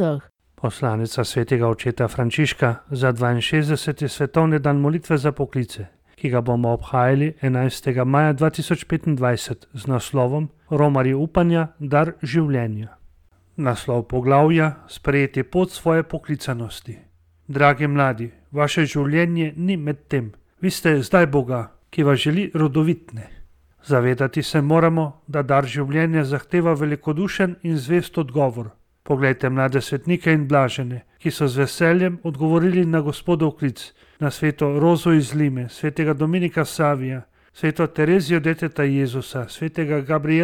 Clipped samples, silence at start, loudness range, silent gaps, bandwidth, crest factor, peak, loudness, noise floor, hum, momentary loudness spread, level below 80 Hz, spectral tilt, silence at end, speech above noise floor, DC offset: under 0.1%; 0 s; 2 LU; none; 16 kHz; 18 dB; -2 dBFS; -21 LUFS; -53 dBFS; none; 10 LU; -48 dBFS; -7 dB/octave; 0 s; 33 dB; under 0.1%